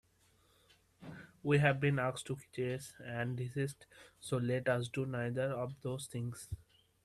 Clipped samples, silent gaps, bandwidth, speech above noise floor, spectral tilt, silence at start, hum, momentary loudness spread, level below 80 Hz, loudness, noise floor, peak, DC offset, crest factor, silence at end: under 0.1%; none; 13 kHz; 34 dB; -6 dB/octave; 1 s; none; 19 LU; -66 dBFS; -37 LUFS; -71 dBFS; -16 dBFS; under 0.1%; 22 dB; 0.45 s